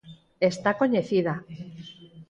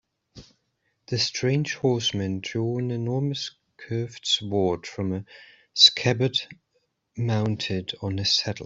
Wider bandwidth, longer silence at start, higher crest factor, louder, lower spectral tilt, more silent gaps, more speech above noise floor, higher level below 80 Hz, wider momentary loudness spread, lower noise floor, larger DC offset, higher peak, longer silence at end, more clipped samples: first, 10.5 kHz vs 7.8 kHz; second, 0.05 s vs 0.35 s; second, 18 dB vs 24 dB; about the same, -25 LUFS vs -24 LUFS; first, -6.5 dB/octave vs -4.5 dB/octave; neither; second, 21 dB vs 49 dB; about the same, -64 dBFS vs -62 dBFS; first, 19 LU vs 13 LU; second, -45 dBFS vs -74 dBFS; neither; second, -8 dBFS vs -2 dBFS; about the same, 0.05 s vs 0 s; neither